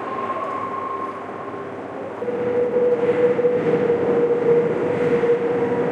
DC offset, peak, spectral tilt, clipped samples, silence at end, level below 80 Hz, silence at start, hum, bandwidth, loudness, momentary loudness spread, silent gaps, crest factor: under 0.1%; -6 dBFS; -8 dB/octave; under 0.1%; 0 s; -62 dBFS; 0 s; none; 6.6 kHz; -21 LUFS; 13 LU; none; 14 dB